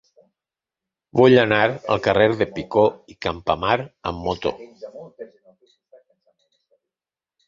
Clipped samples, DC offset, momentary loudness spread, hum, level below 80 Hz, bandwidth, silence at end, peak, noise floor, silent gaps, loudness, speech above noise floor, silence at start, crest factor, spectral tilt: under 0.1%; under 0.1%; 24 LU; none; -50 dBFS; 7.4 kHz; 2.2 s; -2 dBFS; under -90 dBFS; none; -20 LUFS; over 71 dB; 1.15 s; 22 dB; -7 dB/octave